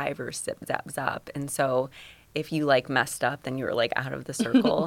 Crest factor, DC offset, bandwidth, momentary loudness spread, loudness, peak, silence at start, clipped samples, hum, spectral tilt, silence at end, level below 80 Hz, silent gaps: 20 dB; under 0.1%; 17 kHz; 11 LU; -28 LUFS; -6 dBFS; 0 s; under 0.1%; none; -4.5 dB/octave; 0 s; -62 dBFS; none